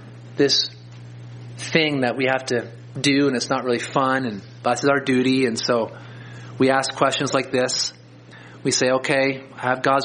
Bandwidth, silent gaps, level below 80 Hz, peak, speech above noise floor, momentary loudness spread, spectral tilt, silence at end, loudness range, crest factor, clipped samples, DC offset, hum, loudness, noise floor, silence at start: 10 kHz; none; -64 dBFS; -2 dBFS; 23 dB; 19 LU; -4 dB/octave; 0 s; 1 LU; 20 dB; under 0.1%; under 0.1%; none; -21 LUFS; -44 dBFS; 0 s